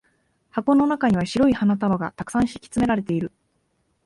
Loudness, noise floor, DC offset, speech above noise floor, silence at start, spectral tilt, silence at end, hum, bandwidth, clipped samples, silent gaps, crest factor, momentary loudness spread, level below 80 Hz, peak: -22 LUFS; -69 dBFS; under 0.1%; 48 dB; 0.55 s; -6.5 dB/octave; 0.8 s; none; 11.5 kHz; under 0.1%; none; 16 dB; 8 LU; -50 dBFS; -8 dBFS